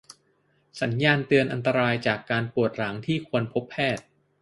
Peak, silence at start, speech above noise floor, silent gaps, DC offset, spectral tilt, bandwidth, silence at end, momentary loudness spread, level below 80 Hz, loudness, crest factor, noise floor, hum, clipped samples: -4 dBFS; 0.1 s; 42 dB; none; under 0.1%; -6.5 dB/octave; 11.5 kHz; 0.4 s; 8 LU; -62 dBFS; -25 LUFS; 22 dB; -67 dBFS; none; under 0.1%